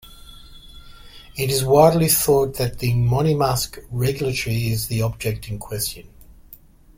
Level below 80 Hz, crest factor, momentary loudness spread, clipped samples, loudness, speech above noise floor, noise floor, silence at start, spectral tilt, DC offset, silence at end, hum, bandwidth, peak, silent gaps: -40 dBFS; 18 dB; 13 LU; under 0.1%; -20 LUFS; 27 dB; -47 dBFS; 0.05 s; -5 dB/octave; under 0.1%; 0.9 s; none; 16.5 kHz; -2 dBFS; none